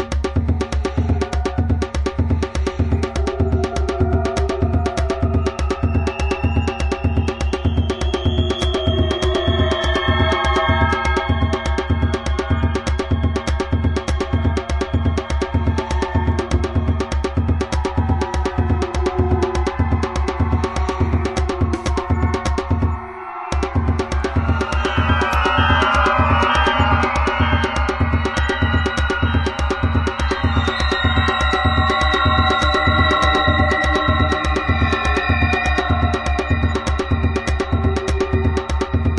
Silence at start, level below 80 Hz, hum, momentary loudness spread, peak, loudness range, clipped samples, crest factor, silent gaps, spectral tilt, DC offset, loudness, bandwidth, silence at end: 0 s; -24 dBFS; none; 6 LU; -2 dBFS; 4 LU; under 0.1%; 16 dB; none; -6 dB/octave; under 0.1%; -19 LUFS; 11 kHz; 0 s